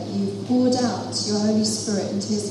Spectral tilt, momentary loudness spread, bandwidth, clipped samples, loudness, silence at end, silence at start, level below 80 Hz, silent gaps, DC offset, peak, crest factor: -4.5 dB/octave; 5 LU; 12.5 kHz; under 0.1%; -22 LUFS; 0 s; 0 s; -66 dBFS; none; under 0.1%; -10 dBFS; 12 dB